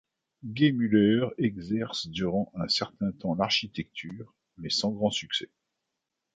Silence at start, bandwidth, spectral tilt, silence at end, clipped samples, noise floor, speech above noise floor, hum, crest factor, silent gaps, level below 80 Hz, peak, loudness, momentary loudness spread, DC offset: 0.45 s; 9.4 kHz; -5 dB/octave; 0.9 s; under 0.1%; -84 dBFS; 56 dB; none; 20 dB; none; -60 dBFS; -10 dBFS; -28 LUFS; 17 LU; under 0.1%